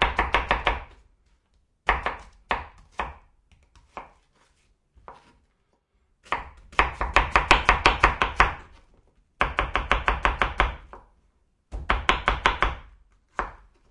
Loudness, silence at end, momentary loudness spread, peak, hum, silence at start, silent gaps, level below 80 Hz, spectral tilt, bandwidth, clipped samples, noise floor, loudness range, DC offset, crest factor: -24 LUFS; 0.35 s; 21 LU; -2 dBFS; none; 0 s; none; -34 dBFS; -4 dB/octave; 11 kHz; under 0.1%; -70 dBFS; 15 LU; under 0.1%; 24 dB